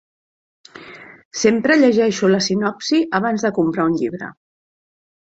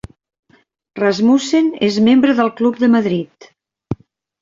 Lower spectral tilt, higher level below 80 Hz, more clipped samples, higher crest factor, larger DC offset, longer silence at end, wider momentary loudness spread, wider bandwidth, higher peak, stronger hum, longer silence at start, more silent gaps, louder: second, -4.5 dB/octave vs -6 dB/octave; second, -60 dBFS vs -52 dBFS; neither; about the same, 18 dB vs 14 dB; neither; first, 0.9 s vs 0.5 s; about the same, 19 LU vs 17 LU; about the same, 8 kHz vs 7.6 kHz; about the same, -2 dBFS vs -2 dBFS; neither; second, 0.75 s vs 0.95 s; first, 1.25-1.31 s vs none; second, -17 LUFS vs -14 LUFS